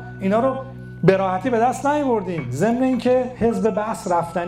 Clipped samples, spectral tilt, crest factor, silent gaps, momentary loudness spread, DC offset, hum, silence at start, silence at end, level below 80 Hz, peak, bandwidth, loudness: under 0.1%; -7 dB/octave; 16 dB; none; 5 LU; under 0.1%; none; 0 s; 0 s; -48 dBFS; -4 dBFS; 15 kHz; -20 LUFS